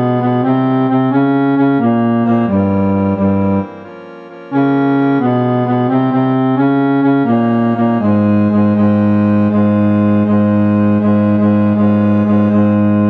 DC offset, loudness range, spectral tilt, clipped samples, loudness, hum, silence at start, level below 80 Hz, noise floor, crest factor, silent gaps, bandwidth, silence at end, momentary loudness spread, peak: under 0.1%; 3 LU; -11 dB/octave; under 0.1%; -12 LUFS; none; 0 s; -54 dBFS; -32 dBFS; 10 dB; none; 4.4 kHz; 0 s; 2 LU; -2 dBFS